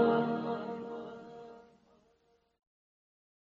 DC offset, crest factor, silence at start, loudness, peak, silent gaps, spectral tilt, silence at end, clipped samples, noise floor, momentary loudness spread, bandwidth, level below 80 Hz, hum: under 0.1%; 22 dB; 0 s; -36 LUFS; -16 dBFS; none; -6 dB/octave; 1.9 s; under 0.1%; -72 dBFS; 21 LU; 6.8 kHz; -76 dBFS; none